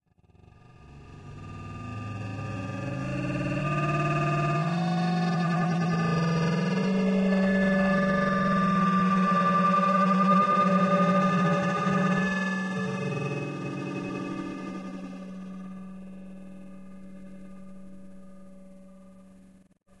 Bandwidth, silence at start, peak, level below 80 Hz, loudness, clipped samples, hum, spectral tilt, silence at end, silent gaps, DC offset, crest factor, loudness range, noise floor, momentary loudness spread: 9.6 kHz; 0.8 s; -10 dBFS; -56 dBFS; -26 LUFS; under 0.1%; none; -7.5 dB/octave; 0.8 s; none; under 0.1%; 16 dB; 18 LU; -57 dBFS; 22 LU